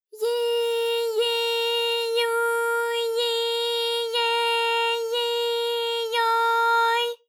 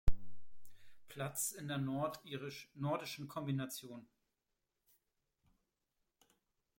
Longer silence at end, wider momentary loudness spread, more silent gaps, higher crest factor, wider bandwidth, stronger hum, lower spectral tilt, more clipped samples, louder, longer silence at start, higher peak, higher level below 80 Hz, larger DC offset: second, 0.15 s vs 2.75 s; second, 4 LU vs 14 LU; neither; second, 12 dB vs 22 dB; about the same, 18 kHz vs 16.5 kHz; neither; second, 4 dB/octave vs -4.5 dB/octave; neither; first, -23 LUFS vs -42 LUFS; about the same, 0.15 s vs 0.05 s; first, -12 dBFS vs -18 dBFS; second, under -90 dBFS vs -50 dBFS; neither